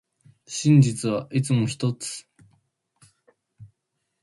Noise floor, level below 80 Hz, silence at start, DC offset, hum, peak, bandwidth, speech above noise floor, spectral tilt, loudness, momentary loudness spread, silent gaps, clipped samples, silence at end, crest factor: -78 dBFS; -62 dBFS; 0.5 s; under 0.1%; none; -6 dBFS; 11.5 kHz; 57 dB; -6 dB/octave; -23 LUFS; 16 LU; none; under 0.1%; 0.55 s; 20 dB